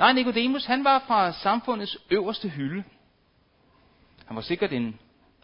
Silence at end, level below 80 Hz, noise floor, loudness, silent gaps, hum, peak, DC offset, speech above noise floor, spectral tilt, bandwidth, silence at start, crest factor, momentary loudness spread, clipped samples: 0.45 s; -62 dBFS; -64 dBFS; -25 LUFS; none; none; -4 dBFS; under 0.1%; 40 dB; -9 dB/octave; 5.6 kHz; 0 s; 22 dB; 14 LU; under 0.1%